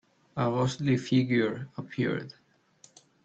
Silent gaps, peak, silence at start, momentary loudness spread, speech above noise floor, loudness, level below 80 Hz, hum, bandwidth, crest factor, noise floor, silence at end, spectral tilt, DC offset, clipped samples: none; -12 dBFS; 0.35 s; 13 LU; 33 dB; -29 LUFS; -66 dBFS; none; 8.2 kHz; 18 dB; -61 dBFS; 0.95 s; -6.5 dB/octave; under 0.1%; under 0.1%